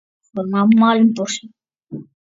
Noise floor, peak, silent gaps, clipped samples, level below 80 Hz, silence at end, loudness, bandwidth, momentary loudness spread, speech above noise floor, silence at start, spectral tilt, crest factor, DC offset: -35 dBFS; -2 dBFS; none; under 0.1%; -68 dBFS; 0.25 s; -16 LUFS; 7.8 kHz; 22 LU; 20 dB; 0.35 s; -5.5 dB/octave; 16 dB; under 0.1%